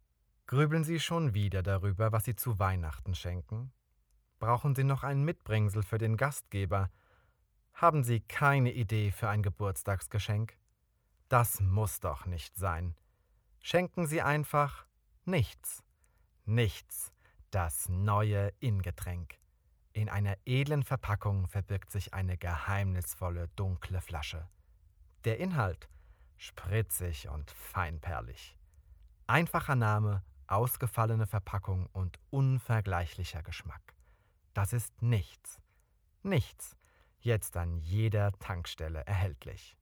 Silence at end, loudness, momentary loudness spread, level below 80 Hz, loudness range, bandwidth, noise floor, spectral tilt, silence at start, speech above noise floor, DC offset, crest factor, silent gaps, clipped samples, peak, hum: 0.1 s; -33 LUFS; 13 LU; -50 dBFS; 6 LU; 19 kHz; -73 dBFS; -6 dB/octave; 0.5 s; 41 dB; under 0.1%; 24 dB; none; under 0.1%; -10 dBFS; none